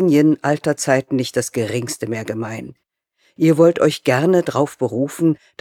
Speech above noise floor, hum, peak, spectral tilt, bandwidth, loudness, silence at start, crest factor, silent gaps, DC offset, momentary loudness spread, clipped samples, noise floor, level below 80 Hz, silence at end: 46 dB; none; 0 dBFS; -6 dB/octave; 16.5 kHz; -18 LUFS; 0 s; 16 dB; none; under 0.1%; 11 LU; under 0.1%; -63 dBFS; -62 dBFS; 0.25 s